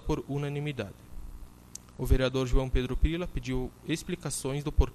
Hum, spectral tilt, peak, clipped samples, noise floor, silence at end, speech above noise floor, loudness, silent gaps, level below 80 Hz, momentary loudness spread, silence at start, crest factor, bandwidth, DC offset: 60 Hz at -50 dBFS; -5.5 dB/octave; -12 dBFS; under 0.1%; -49 dBFS; 0 s; 20 dB; -32 LUFS; none; -34 dBFS; 19 LU; 0 s; 18 dB; 13.5 kHz; under 0.1%